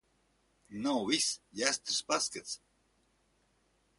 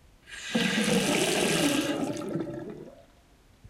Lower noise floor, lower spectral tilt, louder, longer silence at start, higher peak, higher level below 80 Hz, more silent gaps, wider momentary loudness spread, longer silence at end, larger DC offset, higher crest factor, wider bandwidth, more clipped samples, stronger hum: first, -73 dBFS vs -59 dBFS; second, -1.5 dB/octave vs -3.5 dB/octave; second, -32 LUFS vs -27 LUFS; first, 0.7 s vs 0.25 s; about the same, -10 dBFS vs -12 dBFS; second, -74 dBFS vs -58 dBFS; neither; second, 13 LU vs 16 LU; first, 1.4 s vs 0 s; neither; first, 28 dB vs 16 dB; second, 11.5 kHz vs 16.5 kHz; neither; neither